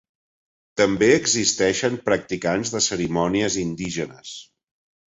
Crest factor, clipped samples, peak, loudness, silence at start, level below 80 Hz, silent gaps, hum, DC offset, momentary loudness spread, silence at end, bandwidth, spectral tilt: 20 dB; under 0.1%; -2 dBFS; -21 LUFS; 0.75 s; -52 dBFS; none; none; under 0.1%; 15 LU; 0.7 s; 8 kHz; -3.5 dB/octave